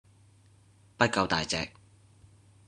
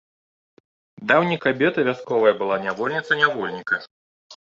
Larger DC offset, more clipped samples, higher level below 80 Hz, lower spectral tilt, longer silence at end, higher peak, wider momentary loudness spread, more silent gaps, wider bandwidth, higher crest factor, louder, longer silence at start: neither; neither; first, -60 dBFS vs -66 dBFS; second, -3.5 dB/octave vs -6 dB/octave; first, 1 s vs 0.15 s; second, -6 dBFS vs -2 dBFS; about the same, 8 LU vs 7 LU; second, none vs 3.91-4.30 s; first, 11.5 kHz vs 7.6 kHz; first, 28 dB vs 20 dB; second, -29 LUFS vs -21 LUFS; about the same, 1 s vs 1 s